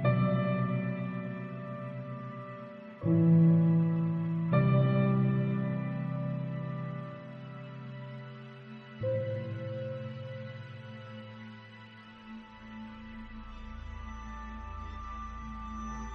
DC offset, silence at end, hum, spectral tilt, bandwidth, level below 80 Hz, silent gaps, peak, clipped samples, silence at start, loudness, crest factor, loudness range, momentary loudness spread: under 0.1%; 0 s; none; -9.5 dB/octave; 6.4 kHz; -52 dBFS; none; -14 dBFS; under 0.1%; 0 s; -31 LUFS; 18 dB; 19 LU; 21 LU